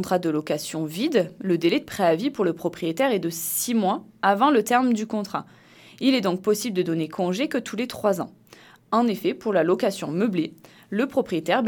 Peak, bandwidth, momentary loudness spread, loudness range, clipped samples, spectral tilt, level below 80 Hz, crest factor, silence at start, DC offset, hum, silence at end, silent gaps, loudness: -4 dBFS; 19 kHz; 7 LU; 3 LU; under 0.1%; -5 dB/octave; -68 dBFS; 18 dB; 0 s; under 0.1%; none; 0 s; none; -24 LUFS